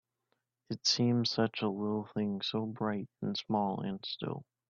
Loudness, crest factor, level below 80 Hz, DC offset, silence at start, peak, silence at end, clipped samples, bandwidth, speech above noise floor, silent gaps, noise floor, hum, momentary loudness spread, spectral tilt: -34 LUFS; 18 dB; -74 dBFS; under 0.1%; 0.7 s; -16 dBFS; 0.3 s; under 0.1%; 7.4 kHz; 48 dB; none; -82 dBFS; none; 9 LU; -5 dB/octave